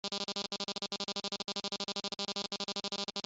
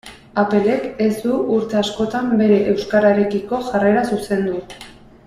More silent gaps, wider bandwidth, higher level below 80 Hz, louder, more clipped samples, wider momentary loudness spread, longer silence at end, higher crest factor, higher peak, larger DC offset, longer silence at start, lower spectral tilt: neither; second, 8.2 kHz vs 13 kHz; second, -76 dBFS vs -50 dBFS; second, -37 LUFS vs -18 LUFS; neither; second, 1 LU vs 8 LU; second, 0.05 s vs 0.35 s; about the same, 20 dB vs 16 dB; second, -20 dBFS vs -2 dBFS; neither; about the same, 0.05 s vs 0.05 s; second, -2 dB/octave vs -6.5 dB/octave